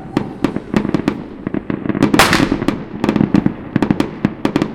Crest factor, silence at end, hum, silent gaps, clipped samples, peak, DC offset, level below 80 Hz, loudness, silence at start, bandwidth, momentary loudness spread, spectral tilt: 16 dB; 0 s; none; none; 0.2%; 0 dBFS; under 0.1%; -38 dBFS; -17 LUFS; 0 s; 17 kHz; 11 LU; -5.5 dB/octave